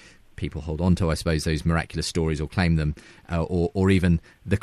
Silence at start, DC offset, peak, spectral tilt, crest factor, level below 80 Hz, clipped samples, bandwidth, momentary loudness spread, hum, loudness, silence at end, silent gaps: 0.4 s; under 0.1%; -8 dBFS; -6.5 dB/octave; 16 dB; -36 dBFS; under 0.1%; 13 kHz; 10 LU; none; -25 LUFS; 0 s; none